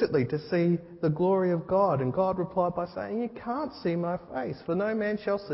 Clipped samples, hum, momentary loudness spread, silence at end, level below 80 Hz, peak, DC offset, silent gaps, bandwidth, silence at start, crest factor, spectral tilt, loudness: under 0.1%; none; 8 LU; 0 s; -60 dBFS; -12 dBFS; under 0.1%; none; 5.8 kHz; 0 s; 14 dB; -11.5 dB/octave; -29 LUFS